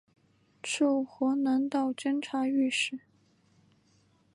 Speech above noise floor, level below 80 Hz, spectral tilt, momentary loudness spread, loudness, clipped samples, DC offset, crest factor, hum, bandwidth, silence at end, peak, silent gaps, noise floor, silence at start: 38 dB; -82 dBFS; -2.5 dB/octave; 7 LU; -29 LUFS; under 0.1%; under 0.1%; 14 dB; none; 11.5 kHz; 1.35 s; -16 dBFS; none; -67 dBFS; 0.65 s